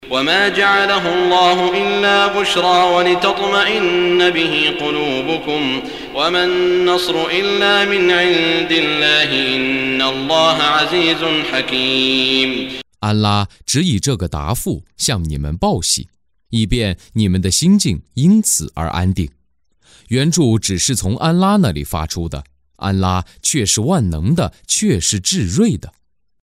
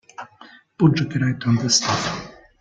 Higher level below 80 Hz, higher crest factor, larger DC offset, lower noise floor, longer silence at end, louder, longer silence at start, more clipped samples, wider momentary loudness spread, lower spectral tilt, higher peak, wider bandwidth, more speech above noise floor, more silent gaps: first, -36 dBFS vs -54 dBFS; about the same, 14 dB vs 18 dB; neither; first, -62 dBFS vs -48 dBFS; first, 0.55 s vs 0.3 s; first, -15 LUFS vs -20 LUFS; second, 0 s vs 0.2 s; neither; second, 8 LU vs 22 LU; about the same, -4 dB/octave vs -4 dB/octave; about the same, -2 dBFS vs -4 dBFS; first, 16 kHz vs 9.4 kHz; first, 47 dB vs 29 dB; neither